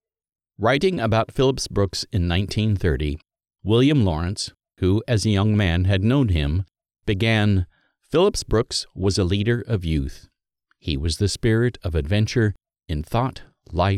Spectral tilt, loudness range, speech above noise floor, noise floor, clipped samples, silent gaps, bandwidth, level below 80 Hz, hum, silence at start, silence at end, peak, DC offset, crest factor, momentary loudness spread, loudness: -6 dB/octave; 3 LU; 50 dB; -71 dBFS; under 0.1%; none; 12.5 kHz; -36 dBFS; none; 0.6 s; 0 s; -6 dBFS; under 0.1%; 16 dB; 10 LU; -22 LUFS